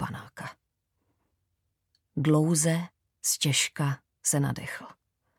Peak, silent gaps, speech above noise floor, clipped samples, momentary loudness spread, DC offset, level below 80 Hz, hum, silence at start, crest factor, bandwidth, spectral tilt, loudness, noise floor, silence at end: -12 dBFS; none; 53 dB; under 0.1%; 18 LU; under 0.1%; -66 dBFS; none; 0 s; 20 dB; 17.5 kHz; -4 dB/octave; -27 LUFS; -79 dBFS; 0.45 s